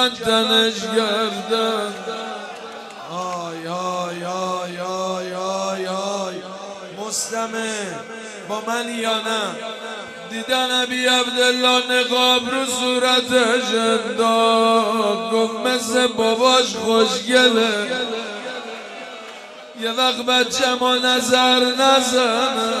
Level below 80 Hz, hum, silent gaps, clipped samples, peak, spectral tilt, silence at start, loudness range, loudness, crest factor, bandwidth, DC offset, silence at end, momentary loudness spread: -66 dBFS; none; none; under 0.1%; 0 dBFS; -2 dB/octave; 0 s; 9 LU; -18 LUFS; 20 dB; 16 kHz; under 0.1%; 0 s; 16 LU